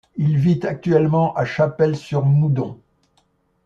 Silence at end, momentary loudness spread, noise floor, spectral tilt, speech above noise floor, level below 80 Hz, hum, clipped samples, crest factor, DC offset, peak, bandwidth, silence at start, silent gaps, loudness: 0.9 s; 4 LU; -63 dBFS; -9 dB/octave; 45 dB; -54 dBFS; none; under 0.1%; 16 dB; under 0.1%; -2 dBFS; 7.2 kHz; 0.15 s; none; -19 LUFS